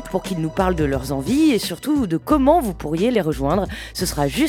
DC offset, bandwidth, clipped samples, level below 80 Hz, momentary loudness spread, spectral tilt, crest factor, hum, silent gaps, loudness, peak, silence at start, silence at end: under 0.1%; 18.5 kHz; under 0.1%; -34 dBFS; 7 LU; -5.5 dB/octave; 16 dB; none; none; -20 LUFS; -2 dBFS; 0 s; 0 s